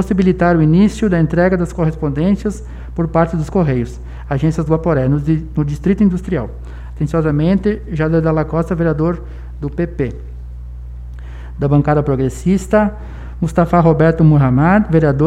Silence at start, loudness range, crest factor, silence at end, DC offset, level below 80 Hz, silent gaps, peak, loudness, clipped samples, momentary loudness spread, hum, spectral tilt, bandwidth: 0 s; 6 LU; 14 dB; 0 s; under 0.1%; -28 dBFS; none; 0 dBFS; -15 LUFS; under 0.1%; 20 LU; 60 Hz at -30 dBFS; -8.5 dB/octave; 10 kHz